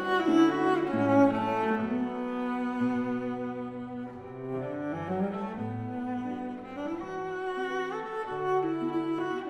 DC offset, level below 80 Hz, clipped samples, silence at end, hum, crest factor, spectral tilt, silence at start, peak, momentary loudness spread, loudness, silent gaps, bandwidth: under 0.1%; -66 dBFS; under 0.1%; 0 s; none; 18 dB; -7 dB/octave; 0 s; -10 dBFS; 13 LU; -30 LUFS; none; 10 kHz